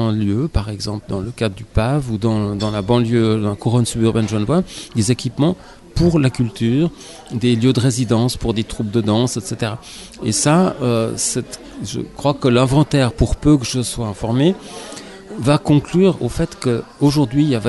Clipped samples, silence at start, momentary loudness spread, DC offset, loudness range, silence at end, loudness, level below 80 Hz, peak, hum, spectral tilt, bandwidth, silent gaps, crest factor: under 0.1%; 0 s; 11 LU; under 0.1%; 2 LU; 0 s; -18 LUFS; -34 dBFS; -2 dBFS; none; -6 dB/octave; 12 kHz; none; 14 dB